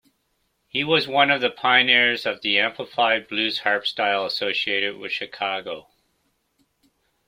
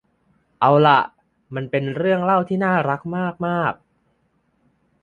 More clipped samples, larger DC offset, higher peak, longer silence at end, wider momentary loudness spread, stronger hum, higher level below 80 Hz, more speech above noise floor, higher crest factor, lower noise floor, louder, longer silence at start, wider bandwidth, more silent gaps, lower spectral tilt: neither; neither; about the same, -2 dBFS vs -2 dBFS; first, 1.5 s vs 1.3 s; second, 11 LU vs 15 LU; neither; second, -70 dBFS vs -62 dBFS; about the same, 49 dB vs 47 dB; about the same, 22 dB vs 20 dB; first, -71 dBFS vs -66 dBFS; about the same, -21 LUFS vs -19 LUFS; first, 0.75 s vs 0.6 s; first, 16 kHz vs 7 kHz; neither; second, -4 dB/octave vs -8.5 dB/octave